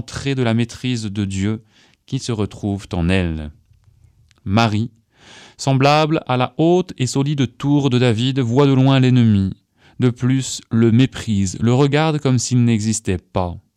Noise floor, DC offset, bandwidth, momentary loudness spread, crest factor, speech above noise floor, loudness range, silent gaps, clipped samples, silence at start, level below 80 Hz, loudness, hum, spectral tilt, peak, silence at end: -53 dBFS; under 0.1%; 11.5 kHz; 10 LU; 18 dB; 36 dB; 6 LU; none; under 0.1%; 0.05 s; -44 dBFS; -18 LUFS; none; -6 dB/octave; 0 dBFS; 0.15 s